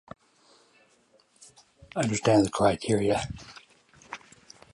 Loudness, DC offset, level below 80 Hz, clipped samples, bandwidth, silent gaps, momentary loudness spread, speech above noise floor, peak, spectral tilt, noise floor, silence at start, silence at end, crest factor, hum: -26 LUFS; under 0.1%; -54 dBFS; under 0.1%; 11.5 kHz; none; 21 LU; 39 dB; -10 dBFS; -5.5 dB/octave; -64 dBFS; 1.95 s; 0.55 s; 20 dB; none